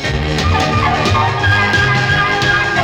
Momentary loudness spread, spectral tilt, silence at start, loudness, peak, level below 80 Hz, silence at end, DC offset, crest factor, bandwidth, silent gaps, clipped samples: 3 LU; -4.5 dB/octave; 0 s; -13 LUFS; 0 dBFS; -28 dBFS; 0 s; under 0.1%; 12 dB; 16.5 kHz; none; under 0.1%